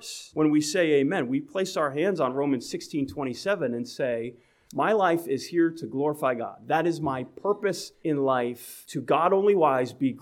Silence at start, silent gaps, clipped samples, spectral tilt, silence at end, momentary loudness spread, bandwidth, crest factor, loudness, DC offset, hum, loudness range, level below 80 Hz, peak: 0 s; none; under 0.1%; -5.5 dB/octave; 0 s; 10 LU; 16.5 kHz; 18 dB; -26 LUFS; under 0.1%; none; 2 LU; -68 dBFS; -8 dBFS